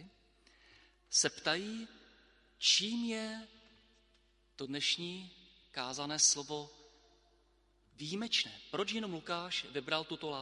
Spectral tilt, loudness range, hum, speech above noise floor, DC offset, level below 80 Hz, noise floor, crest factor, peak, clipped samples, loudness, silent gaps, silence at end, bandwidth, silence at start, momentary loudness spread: -1 dB/octave; 5 LU; none; 35 dB; under 0.1%; -74 dBFS; -71 dBFS; 24 dB; -16 dBFS; under 0.1%; -34 LUFS; none; 0 s; 11.5 kHz; 0 s; 18 LU